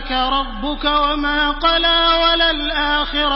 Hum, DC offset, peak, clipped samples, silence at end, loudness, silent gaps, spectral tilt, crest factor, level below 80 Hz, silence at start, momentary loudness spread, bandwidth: none; under 0.1%; -2 dBFS; under 0.1%; 0 s; -16 LUFS; none; -7.5 dB/octave; 14 dB; -30 dBFS; 0 s; 6 LU; 5.8 kHz